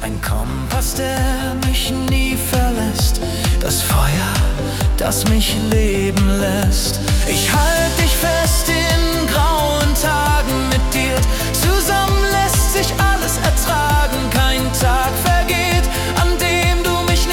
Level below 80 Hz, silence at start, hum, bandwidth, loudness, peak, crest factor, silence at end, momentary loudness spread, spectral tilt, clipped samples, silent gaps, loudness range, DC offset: -20 dBFS; 0 s; none; 18 kHz; -16 LUFS; -4 dBFS; 12 dB; 0 s; 4 LU; -4 dB/octave; under 0.1%; none; 2 LU; under 0.1%